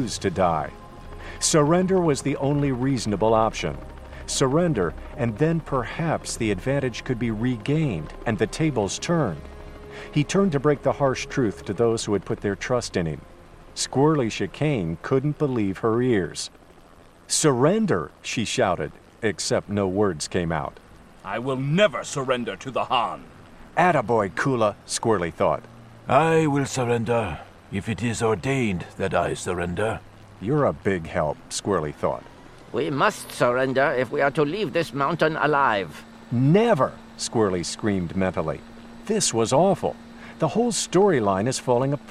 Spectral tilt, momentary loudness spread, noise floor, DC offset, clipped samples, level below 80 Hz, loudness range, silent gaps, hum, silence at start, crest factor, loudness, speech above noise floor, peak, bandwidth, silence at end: -5 dB/octave; 11 LU; -50 dBFS; 0.1%; under 0.1%; -46 dBFS; 3 LU; none; none; 0 s; 18 dB; -23 LUFS; 27 dB; -4 dBFS; 14 kHz; 0 s